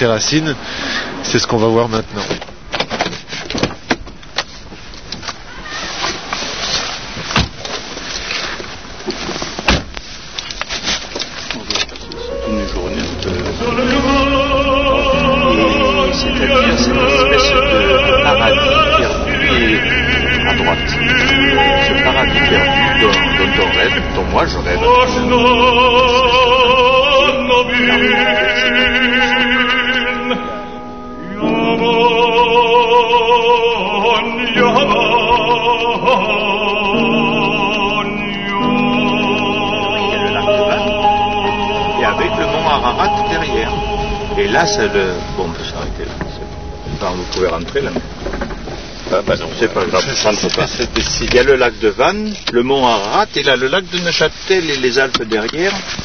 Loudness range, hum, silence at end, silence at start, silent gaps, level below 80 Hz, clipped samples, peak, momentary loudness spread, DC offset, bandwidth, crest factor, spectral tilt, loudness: 10 LU; none; 0 s; 0 s; none; -30 dBFS; under 0.1%; 0 dBFS; 13 LU; 2%; 6.6 kHz; 14 dB; -4 dB/octave; -13 LUFS